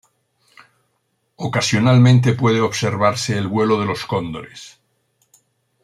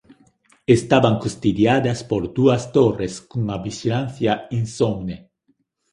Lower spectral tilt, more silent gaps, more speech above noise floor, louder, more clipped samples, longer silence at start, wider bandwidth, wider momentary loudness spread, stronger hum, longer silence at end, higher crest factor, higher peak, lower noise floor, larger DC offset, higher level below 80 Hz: about the same, -6 dB/octave vs -6.5 dB/octave; neither; first, 52 dB vs 47 dB; first, -17 LUFS vs -20 LUFS; neither; first, 1.4 s vs 0.7 s; about the same, 12 kHz vs 11.5 kHz; first, 17 LU vs 11 LU; neither; first, 1.15 s vs 0.75 s; about the same, 16 dB vs 20 dB; about the same, -2 dBFS vs 0 dBFS; about the same, -69 dBFS vs -66 dBFS; neither; second, -56 dBFS vs -48 dBFS